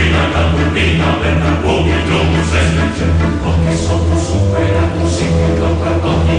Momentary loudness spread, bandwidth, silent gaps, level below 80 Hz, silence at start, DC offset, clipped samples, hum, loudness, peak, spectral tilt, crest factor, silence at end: 2 LU; 10 kHz; none; -24 dBFS; 0 s; under 0.1%; under 0.1%; none; -14 LUFS; -2 dBFS; -6 dB/octave; 10 dB; 0 s